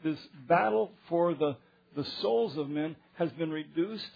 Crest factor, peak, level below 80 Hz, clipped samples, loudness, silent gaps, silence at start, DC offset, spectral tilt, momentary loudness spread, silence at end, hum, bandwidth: 20 dB; -12 dBFS; -74 dBFS; under 0.1%; -31 LUFS; none; 0 s; under 0.1%; -8 dB/octave; 11 LU; 0.05 s; none; 5 kHz